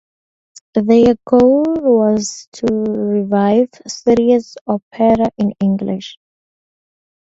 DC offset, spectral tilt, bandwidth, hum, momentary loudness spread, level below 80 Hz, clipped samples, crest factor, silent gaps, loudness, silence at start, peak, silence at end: under 0.1%; -6.5 dB/octave; 8 kHz; none; 11 LU; -48 dBFS; under 0.1%; 16 dB; 2.47-2.52 s, 4.61-4.65 s, 4.83-4.91 s; -15 LUFS; 0.75 s; 0 dBFS; 1.15 s